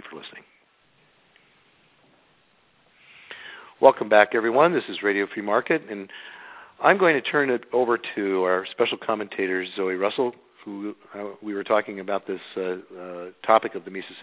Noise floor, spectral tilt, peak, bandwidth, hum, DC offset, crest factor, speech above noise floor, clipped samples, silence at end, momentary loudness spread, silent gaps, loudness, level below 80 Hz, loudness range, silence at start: -62 dBFS; -8.5 dB/octave; 0 dBFS; 4 kHz; none; under 0.1%; 24 dB; 39 dB; under 0.1%; 0 s; 21 LU; none; -23 LUFS; -74 dBFS; 6 LU; 0.05 s